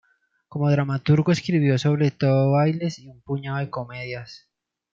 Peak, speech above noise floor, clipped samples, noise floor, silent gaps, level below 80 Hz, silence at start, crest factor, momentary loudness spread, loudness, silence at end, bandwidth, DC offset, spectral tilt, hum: -6 dBFS; 33 dB; under 0.1%; -55 dBFS; none; -62 dBFS; 0.55 s; 16 dB; 14 LU; -22 LUFS; 0.55 s; 7.6 kHz; under 0.1%; -7.5 dB/octave; none